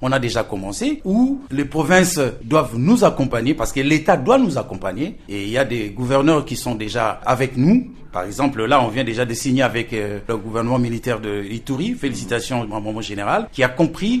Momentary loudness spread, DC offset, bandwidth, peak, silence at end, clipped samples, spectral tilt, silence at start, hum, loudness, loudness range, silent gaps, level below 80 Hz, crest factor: 11 LU; under 0.1%; 13.5 kHz; -2 dBFS; 0 s; under 0.1%; -5.5 dB/octave; 0 s; none; -19 LUFS; 5 LU; none; -40 dBFS; 18 dB